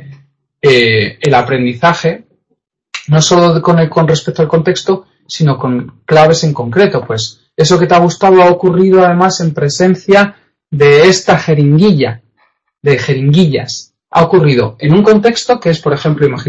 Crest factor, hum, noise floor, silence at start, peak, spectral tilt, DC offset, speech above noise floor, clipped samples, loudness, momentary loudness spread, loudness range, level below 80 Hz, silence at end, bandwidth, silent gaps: 10 dB; none; -65 dBFS; 0.05 s; 0 dBFS; -5.5 dB/octave; under 0.1%; 56 dB; 0.3%; -10 LUFS; 10 LU; 3 LU; -46 dBFS; 0 s; 8.2 kHz; none